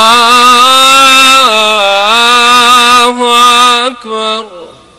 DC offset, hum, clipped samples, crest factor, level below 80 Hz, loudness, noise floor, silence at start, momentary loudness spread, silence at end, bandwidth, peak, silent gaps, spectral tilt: 1%; none; 2%; 6 dB; -44 dBFS; -4 LUFS; -30 dBFS; 0 s; 11 LU; 0.3 s; 16.5 kHz; 0 dBFS; none; 0 dB/octave